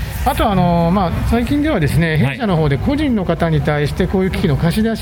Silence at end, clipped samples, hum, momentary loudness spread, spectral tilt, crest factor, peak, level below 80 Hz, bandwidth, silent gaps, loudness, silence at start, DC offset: 0 s; under 0.1%; none; 3 LU; -7 dB/octave; 12 dB; -2 dBFS; -26 dBFS; 18 kHz; none; -16 LUFS; 0 s; under 0.1%